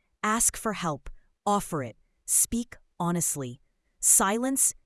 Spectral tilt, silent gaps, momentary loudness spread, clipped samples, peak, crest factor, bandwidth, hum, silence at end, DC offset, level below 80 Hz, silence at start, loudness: -3 dB/octave; none; 19 LU; under 0.1%; -6 dBFS; 22 dB; 12 kHz; none; 0.15 s; under 0.1%; -52 dBFS; 0.25 s; -25 LUFS